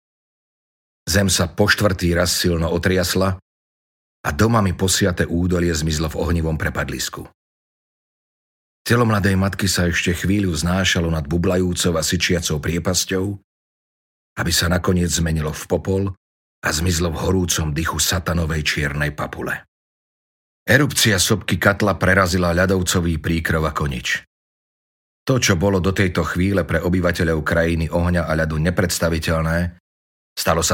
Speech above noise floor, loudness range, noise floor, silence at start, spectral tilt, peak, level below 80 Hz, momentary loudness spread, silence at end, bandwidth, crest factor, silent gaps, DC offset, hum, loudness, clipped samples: over 71 dB; 4 LU; under -90 dBFS; 1.05 s; -4.5 dB/octave; 0 dBFS; -34 dBFS; 8 LU; 0 s; 17 kHz; 20 dB; 3.42-4.24 s, 7.34-8.85 s, 13.44-14.36 s, 16.17-16.62 s, 19.68-20.66 s, 24.27-25.26 s, 29.80-30.36 s; under 0.1%; none; -19 LUFS; under 0.1%